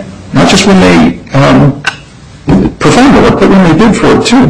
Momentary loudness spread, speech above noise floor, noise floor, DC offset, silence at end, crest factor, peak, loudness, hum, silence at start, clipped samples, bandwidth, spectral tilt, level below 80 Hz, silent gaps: 7 LU; 26 dB; -30 dBFS; under 0.1%; 0 s; 6 dB; 0 dBFS; -5 LUFS; none; 0 s; 0.5%; 11.5 kHz; -5.5 dB/octave; -24 dBFS; none